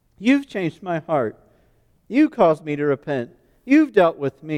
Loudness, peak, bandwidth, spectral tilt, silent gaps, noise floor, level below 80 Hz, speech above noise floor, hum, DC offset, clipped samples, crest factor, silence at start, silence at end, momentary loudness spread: -20 LUFS; -4 dBFS; 9.4 kHz; -7.5 dB/octave; none; -59 dBFS; -60 dBFS; 40 dB; none; under 0.1%; under 0.1%; 18 dB; 0.2 s; 0 s; 11 LU